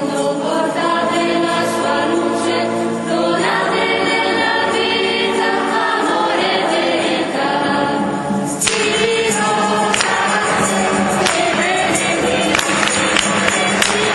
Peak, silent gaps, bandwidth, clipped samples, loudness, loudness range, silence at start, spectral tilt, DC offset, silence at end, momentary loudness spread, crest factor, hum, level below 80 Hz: 0 dBFS; none; 12 kHz; under 0.1%; -15 LUFS; 2 LU; 0 s; -3 dB/octave; under 0.1%; 0 s; 4 LU; 16 dB; none; -50 dBFS